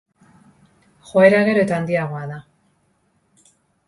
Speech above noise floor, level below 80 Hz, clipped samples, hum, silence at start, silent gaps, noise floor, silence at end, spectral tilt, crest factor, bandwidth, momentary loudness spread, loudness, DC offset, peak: 47 dB; -60 dBFS; under 0.1%; none; 1.15 s; none; -64 dBFS; 1.45 s; -7 dB/octave; 20 dB; 11.5 kHz; 19 LU; -17 LUFS; under 0.1%; 0 dBFS